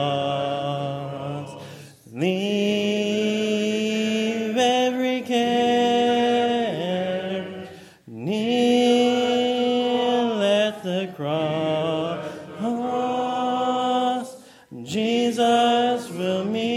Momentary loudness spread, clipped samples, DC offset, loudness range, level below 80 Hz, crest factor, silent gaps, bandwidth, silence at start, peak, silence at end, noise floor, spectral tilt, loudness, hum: 12 LU; under 0.1%; under 0.1%; 4 LU; -72 dBFS; 16 dB; none; 14.5 kHz; 0 s; -8 dBFS; 0 s; -42 dBFS; -5 dB/octave; -22 LUFS; none